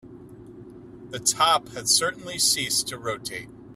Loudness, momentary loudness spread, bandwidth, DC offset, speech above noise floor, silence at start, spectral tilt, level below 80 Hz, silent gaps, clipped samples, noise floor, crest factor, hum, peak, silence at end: -22 LUFS; 13 LU; 15.5 kHz; under 0.1%; 19 dB; 0.05 s; -0.5 dB/octave; -60 dBFS; none; under 0.1%; -44 dBFS; 20 dB; none; -6 dBFS; 0 s